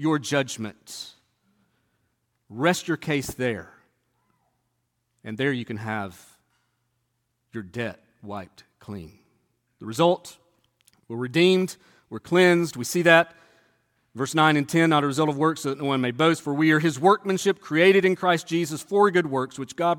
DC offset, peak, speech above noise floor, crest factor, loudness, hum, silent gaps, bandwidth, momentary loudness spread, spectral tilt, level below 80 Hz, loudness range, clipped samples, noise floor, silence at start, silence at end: under 0.1%; -2 dBFS; 52 dB; 22 dB; -22 LUFS; none; none; 17.5 kHz; 19 LU; -5 dB/octave; -64 dBFS; 12 LU; under 0.1%; -75 dBFS; 0 s; 0 s